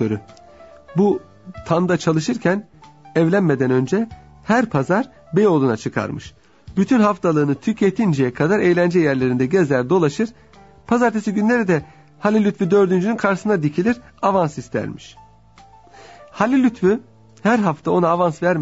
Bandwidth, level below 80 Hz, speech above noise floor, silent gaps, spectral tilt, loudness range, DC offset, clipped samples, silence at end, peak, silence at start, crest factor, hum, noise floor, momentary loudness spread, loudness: 8 kHz; -54 dBFS; 30 dB; none; -7 dB/octave; 4 LU; 0.2%; under 0.1%; 0 s; -2 dBFS; 0 s; 16 dB; none; -48 dBFS; 9 LU; -19 LUFS